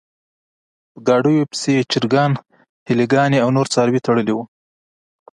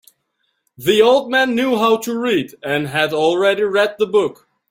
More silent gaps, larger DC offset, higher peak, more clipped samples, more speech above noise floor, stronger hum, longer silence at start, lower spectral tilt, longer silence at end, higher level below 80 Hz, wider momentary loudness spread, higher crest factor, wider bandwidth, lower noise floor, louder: first, 2.69-2.86 s vs none; neither; about the same, -2 dBFS vs -2 dBFS; neither; first, over 74 dB vs 53 dB; neither; first, 0.95 s vs 0.8 s; first, -6 dB/octave vs -4.5 dB/octave; first, 0.95 s vs 0.35 s; about the same, -62 dBFS vs -60 dBFS; about the same, 8 LU vs 8 LU; about the same, 16 dB vs 16 dB; second, 11.5 kHz vs 16.5 kHz; first, under -90 dBFS vs -69 dBFS; about the same, -17 LUFS vs -16 LUFS